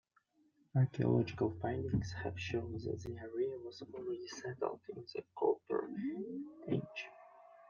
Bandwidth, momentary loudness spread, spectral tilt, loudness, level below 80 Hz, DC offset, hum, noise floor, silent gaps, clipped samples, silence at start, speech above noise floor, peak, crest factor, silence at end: 7.2 kHz; 13 LU; -7.5 dB/octave; -39 LUFS; -64 dBFS; under 0.1%; none; -74 dBFS; none; under 0.1%; 0.75 s; 36 dB; -20 dBFS; 20 dB; 0.05 s